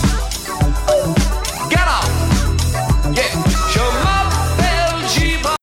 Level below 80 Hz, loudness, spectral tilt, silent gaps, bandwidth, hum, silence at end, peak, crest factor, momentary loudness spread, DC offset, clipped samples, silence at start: -20 dBFS; -16 LUFS; -4.5 dB/octave; none; 16.5 kHz; none; 0.05 s; -2 dBFS; 12 dB; 3 LU; under 0.1%; under 0.1%; 0 s